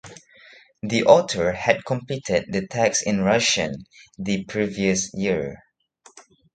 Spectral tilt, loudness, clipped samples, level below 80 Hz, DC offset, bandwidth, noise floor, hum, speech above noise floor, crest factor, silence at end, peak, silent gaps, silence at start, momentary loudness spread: -4 dB/octave; -21 LUFS; under 0.1%; -52 dBFS; under 0.1%; 9.4 kHz; -56 dBFS; none; 34 dB; 22 dB; 0.35 s; 0 dBFS; none; 0.05 s; 11 LU